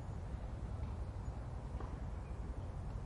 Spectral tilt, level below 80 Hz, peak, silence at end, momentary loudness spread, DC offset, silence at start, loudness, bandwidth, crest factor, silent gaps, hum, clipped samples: -8 dB/octave; -46 dBFS; -32 dBFS; 0 s; 2 LU; under 0.1%; 0 s; -46 LUFS; 11 kHz; 12 dB; none; none; under 0.1%